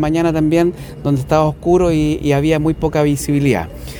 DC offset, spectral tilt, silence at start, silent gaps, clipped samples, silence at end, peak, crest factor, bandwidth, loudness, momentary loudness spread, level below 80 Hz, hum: under 0.1%; -7 dB/octave; 0 s; none; under 0.1%; 0 s; 0 dBFS; 14 dB; 19 kHz; -16 LUFS; 5 LU; -32 dBFS; none